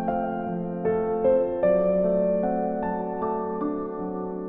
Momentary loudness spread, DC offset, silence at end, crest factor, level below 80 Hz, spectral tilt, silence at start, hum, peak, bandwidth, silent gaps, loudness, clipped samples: 8 LU; under 0.1%; 0 s; 14 dB; -52 dBFS; -12.5 dB/octave; 0 s; none; -10 dBFS; 3.8 kHz; none; -25 LUFS; under 0.1%